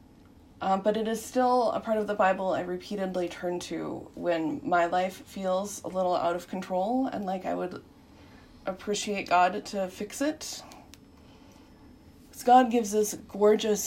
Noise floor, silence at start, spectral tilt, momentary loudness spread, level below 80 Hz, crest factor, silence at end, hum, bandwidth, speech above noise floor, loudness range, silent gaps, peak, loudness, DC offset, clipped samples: -54 dBFS; 0.6 s; -4.5 dB/octave; 11 LU; -62 dBFS; 20 dB; 0 s; none; 16 kHz; 27 dB; 4 LU; none; -10 dBFS; -28 LUFS; under 0.1%; under 0.1%